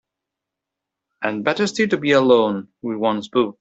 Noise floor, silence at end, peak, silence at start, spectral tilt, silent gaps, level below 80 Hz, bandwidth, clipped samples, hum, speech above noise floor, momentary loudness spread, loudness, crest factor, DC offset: -84 dBFS; 0.1 s; -2 dBFS; 1.2 s; -5 dB/octave; none; -64 dBFS; 8.2 kHz; under 0.1%; none; 65 dB; 12 LU; -19 LUFS; 18 dB; under 0.1%